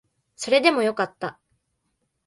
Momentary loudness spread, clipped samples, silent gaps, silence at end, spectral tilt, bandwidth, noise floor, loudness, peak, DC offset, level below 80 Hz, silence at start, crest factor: 16 LU; under 0.1%; none; 0.95 s; -3.5 dB/octave; 11.5 kHz; -75 dBFS; -21 LUFS; -4 dBFS; under 0.1%; -72 dBFS; 0.4 s; 22 dB